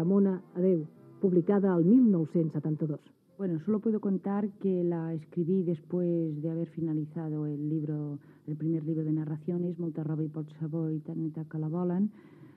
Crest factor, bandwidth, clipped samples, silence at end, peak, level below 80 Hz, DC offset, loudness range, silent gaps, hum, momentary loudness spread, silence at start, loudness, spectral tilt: 16 dB; 3.5 kHz; under 0.1%; 0.1 s; -14 dBFS; -88 dBFS; under 0.1%; 6 LU; none; none; 10 LU; 0 s; -30 LUFS; -12.5 dB/octave